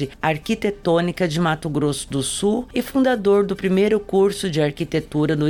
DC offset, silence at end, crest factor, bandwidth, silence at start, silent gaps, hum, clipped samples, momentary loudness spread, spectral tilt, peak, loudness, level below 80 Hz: under 0.1%; 0 s; 14 dB; 19 kHz; 0 s; none; none; under 0.1%; 5 LU; -5.5 dB/octave; -6 dBFS; -20 LUFS; -46 dBFS